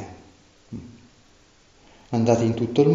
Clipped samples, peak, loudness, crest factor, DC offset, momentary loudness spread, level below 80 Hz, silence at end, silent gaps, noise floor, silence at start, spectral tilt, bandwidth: under 0.1%; -6 dBFS; -22 LUFS; 20 dB; under 0.1%; 21 LU; -56 dBFS; 0 s; none; -56 dBFS; 0 s; -7.5 dB/octave; 7.8 kHz